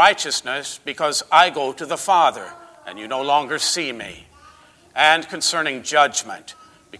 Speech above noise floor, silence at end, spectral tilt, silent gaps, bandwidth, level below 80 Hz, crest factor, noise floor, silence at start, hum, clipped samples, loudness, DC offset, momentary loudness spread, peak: 30 dB; 0 s; -1 dB/octave; none; 11 kHz; -62 dBFS; 18 dB; -50 dBFS; 0 s; none; under 0.1%; -19 LUFS; under 0.1%; 20 LU; -2 dBFS